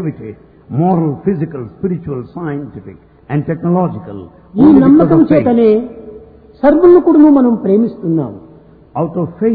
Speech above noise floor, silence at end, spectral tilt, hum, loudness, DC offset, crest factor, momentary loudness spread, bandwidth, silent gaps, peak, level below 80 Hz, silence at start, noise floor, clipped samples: 29 dB; 0 s; -13 dB/octave; none; -11 LUFS; under 0.1%; 12 dB; 20 LU; 4.7 kHz; none; 0 dBFS; -44 dBFS; 0 s; -41 dBFS; under 0.1%